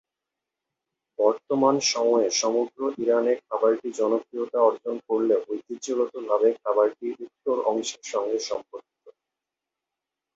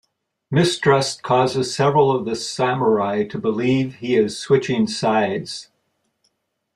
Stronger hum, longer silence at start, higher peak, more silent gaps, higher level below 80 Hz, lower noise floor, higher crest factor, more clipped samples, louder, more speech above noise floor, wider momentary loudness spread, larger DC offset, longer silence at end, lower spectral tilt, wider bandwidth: neither; first, 1.2 s vs 0.5 s; second, -8 dBFS vs -2 dBFS; neither; second, -76 dBFS vs -58 dBFS; first, -87 dBFS vs -70 dBFS; about the same, 18 dB vs 18 dB; neither; second, -25 LUFS vs -19 LUFS; first, 63 dB vs 51 dB; first, 11 LU vs 6 LU; neither; about the same, 1.25 s vs 1.15 s; second, -3 dB/octave vs -5.5 dB/octave; second, 8 kHz vs 12.5 kHz